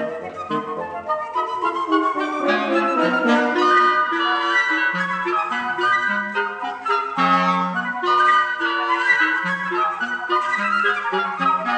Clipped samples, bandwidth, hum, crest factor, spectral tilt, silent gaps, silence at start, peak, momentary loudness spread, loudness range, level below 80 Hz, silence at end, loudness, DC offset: under 0.1%; 9.2 kHz; none; 16 dB; -4.5 dB/octave; none; 0 s; -4 dBFS; 9 LU; 2 LU; -70 dBFS; 0 s; -19 LUFS; under 0.1%